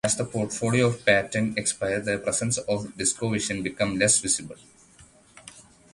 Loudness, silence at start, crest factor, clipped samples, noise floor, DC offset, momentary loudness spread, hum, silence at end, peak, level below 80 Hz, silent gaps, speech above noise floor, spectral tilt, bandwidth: -24 LUFS; 0.05 s; 24 dB; under 0.1%; -54 dBFS; under 0.1%; 7 LU; none; 0.3 s; -2 dBFS; -56 dBFS; none; 29 dB; -3.5 dB/octave; 11.5 kHz